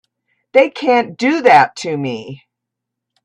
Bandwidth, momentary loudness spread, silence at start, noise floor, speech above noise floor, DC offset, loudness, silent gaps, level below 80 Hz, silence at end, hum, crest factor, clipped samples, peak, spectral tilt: 10.5 kHz; 14 LU; 0.55 s; -80 dBFS; 66 dB; under 0.1%; -14 LUFS; none; -62 dBFS; 0.9 s; none; 16 dB; under 0.1%; 0 dBFS; -5 dB/octave